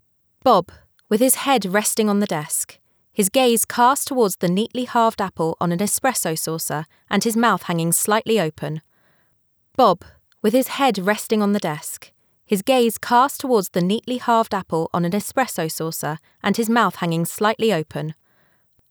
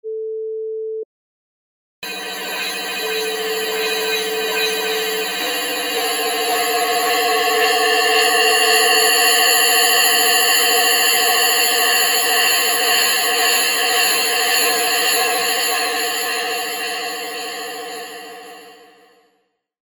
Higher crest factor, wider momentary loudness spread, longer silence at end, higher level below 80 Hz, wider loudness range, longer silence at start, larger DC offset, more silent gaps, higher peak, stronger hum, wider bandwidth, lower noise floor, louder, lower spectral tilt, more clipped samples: about the same, 16 dB vs 18 dB; second, 9 LU vs 14 LU; second, 0.8 s vs 1.2 s; first, -64 dBFS vs -74 dBFS; second, 3 LU vs 12 LU; first, 0.45 s vs 0.05 s; neither; second, none vs 1.05-2.02 s; second, -4 dBFS vs 0 dBFS; neither; about the same, over 20 kHz vs over 20 kHz; about the same, -64 dBFS vs -67 dBFS; second, -20 LUFS vs -15 LUFS; first, -4 dB/octave vs 1.5 dB/octave; neither